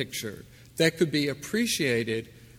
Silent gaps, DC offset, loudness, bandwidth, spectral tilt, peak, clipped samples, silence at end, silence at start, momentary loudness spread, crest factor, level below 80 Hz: none; under 0.1%; -27 LUFS; 18 kHz; -4 dB/octave; -8 dBFS; under 0.1%; 0 s; 0 s; 14 LU; 20 dB; -60 dBFS